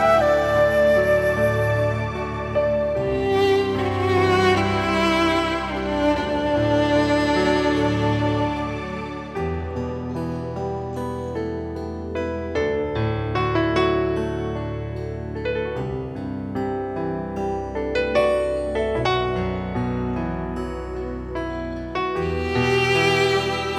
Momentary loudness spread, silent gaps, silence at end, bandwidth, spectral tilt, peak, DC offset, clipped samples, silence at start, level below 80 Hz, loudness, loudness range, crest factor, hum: 11 LU; none; 0 s; 14 kHz; -6 dB/octave; -6 dBFS; under 0.1%; under 0.1%; 0 s; -38 dBFS; -22 LUFS; 7 LU; 16 dB; none